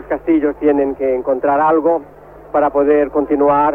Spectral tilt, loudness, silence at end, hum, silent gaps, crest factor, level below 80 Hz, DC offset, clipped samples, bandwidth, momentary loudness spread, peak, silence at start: -9.5 dB/octave; -15 LUFS; 0 s; none; none; 12 dB; -44 dBFS; under 0.1%; under 0.1%; 3.6 kHz; 5 LU; -2 dBFS; 0 s